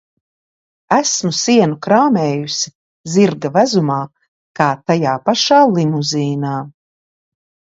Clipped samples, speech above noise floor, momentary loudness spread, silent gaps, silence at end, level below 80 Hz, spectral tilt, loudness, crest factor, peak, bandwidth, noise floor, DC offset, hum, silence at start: under 0.1%; over 76 dB; 11 LU; 2.75-3.04 s, 4.28-4.54 s; 0.95 s; -62 dBFS; -4.5 dB/octave; -15 LUFS; 16 dB; 0 dBFS; 8 kHz; under -90 dBFS; under 0.1%; none; 0.9 s